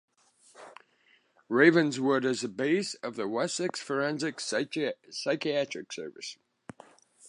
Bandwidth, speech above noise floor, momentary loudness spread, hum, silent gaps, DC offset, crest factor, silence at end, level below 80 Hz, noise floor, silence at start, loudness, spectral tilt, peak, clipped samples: 11 kHz; 37 dB; 20 LU; none; none; under 0.1%; 22 dB; 0 s; -82 dBFS; -66 dBFS; 0.6 s; -29 LUFS; -4.5 dB/octave; -8 dBFS; under 0.1%